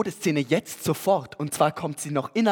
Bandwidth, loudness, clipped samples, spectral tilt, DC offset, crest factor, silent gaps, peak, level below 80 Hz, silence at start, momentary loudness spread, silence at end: over 20 kHz; -25 LUFS; under 0.1%; -5 dB/octave; under 0.1%; 20 dB; none; -6 dBFS; -66 dBFS; 0 s; 5 LU; 0 s